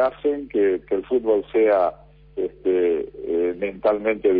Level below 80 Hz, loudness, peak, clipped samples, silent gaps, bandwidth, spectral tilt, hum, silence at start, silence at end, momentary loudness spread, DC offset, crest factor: -52 dBFS; -22 LUFS; -8 dBFS; under 0.1%; none; 4.7 kHz; -9.5 dB/octave; none; 0 s; 0 s; 8 LU; under 0.1%; 14 dB